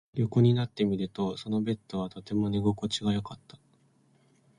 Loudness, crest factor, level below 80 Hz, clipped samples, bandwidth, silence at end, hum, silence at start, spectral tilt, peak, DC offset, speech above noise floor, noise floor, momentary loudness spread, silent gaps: -29 LUFS; 18 dB; -58 dBFS; under 0.1%; 10.5 kHz; 1.25 s; none; 0.15 s; -7 dB/octave; -12 dBFS; under 0.1%; 37 dB; -65 dBFS; 11 LU; none